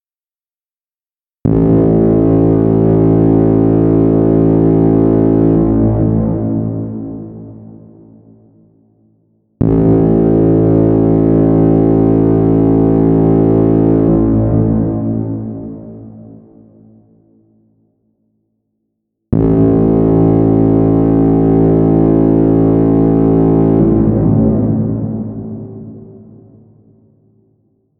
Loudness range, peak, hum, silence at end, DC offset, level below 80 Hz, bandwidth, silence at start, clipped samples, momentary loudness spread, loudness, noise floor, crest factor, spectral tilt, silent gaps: 11 LU; 0 dBFS; none; 1.9 s; under 0.1%; -28 dBFS; 3 kHz; 1.45 s; under 0.1%; 12 LU; -11 LUFS; under -90 dBFS; 12 dB; -14 dB/octave; none